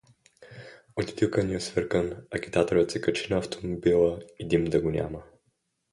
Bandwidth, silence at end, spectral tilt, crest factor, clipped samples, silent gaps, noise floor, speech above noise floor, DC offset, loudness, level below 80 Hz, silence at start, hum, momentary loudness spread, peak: 11.5 kHz; 0.7 s; -6 dB/octave; 18 dB; under 0.1%; none; -74 dBFS; 48 dB; under 0.1%; -27 LUFS; -50 dBFS; 0.4 s; none; 14 LU; -10 dBFS